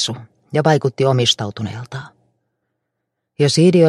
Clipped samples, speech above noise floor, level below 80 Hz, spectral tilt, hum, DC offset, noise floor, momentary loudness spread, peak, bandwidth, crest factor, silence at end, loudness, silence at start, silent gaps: under 0.1%; 61 dB; -60 dBFS; -5.5 dB/octave; none; under 0.1%; -76 dBFS; 18 LU; 0 dBFS; 12.5 kHz; 18 dB; 0 s; -17 LUFS; 0 s; none